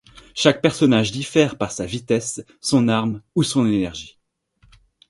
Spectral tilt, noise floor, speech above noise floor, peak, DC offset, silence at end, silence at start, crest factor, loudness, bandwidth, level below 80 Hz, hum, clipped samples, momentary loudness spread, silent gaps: -5 dB/octave; -60 dBFS; 41 dB; 0 dBFS; under 0.1%; 1 s; 0.35 s; 20 dB; -20 LUFS; 11.5 kHz; -52 dBFS; none; under 0.1%; 11 LU; none